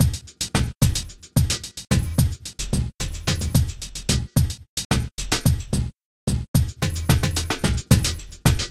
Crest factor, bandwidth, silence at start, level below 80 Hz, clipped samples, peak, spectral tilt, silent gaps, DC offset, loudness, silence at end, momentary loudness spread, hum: 20 dB; 15.5 kHz; 0 s; -30 dBFS; under 0.1%; -2 dBFS; -4.5 dB/octave; 4.69-4.77 s, 4.85-4.90 s, 6.05-6.27 s, 6.48-6.54 s; under 0.1%; -23 LUFS; 0 s; 8 LU; none